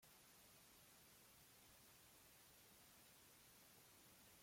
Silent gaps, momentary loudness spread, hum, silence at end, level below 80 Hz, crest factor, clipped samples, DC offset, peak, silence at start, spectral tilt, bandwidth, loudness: none; 0 LU; none; 0 s; -86 dBFS; 14 dB; under 0.1%; under 0.1%; -56 dBFS; 0 s; -2 dB/octave; 16.5 kHz; -67 LUFS